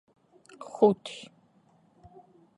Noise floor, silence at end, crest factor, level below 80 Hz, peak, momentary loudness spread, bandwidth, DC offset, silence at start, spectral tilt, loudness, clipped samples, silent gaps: -64 dBFS; 1.4 s; 24 dB; -74 dBFS; -8 dBFS; 24 LU; 11 kHz; under 0.1%; 0.8 s; -6.5 dB/octave; -26 LUFS; under 0.1%; none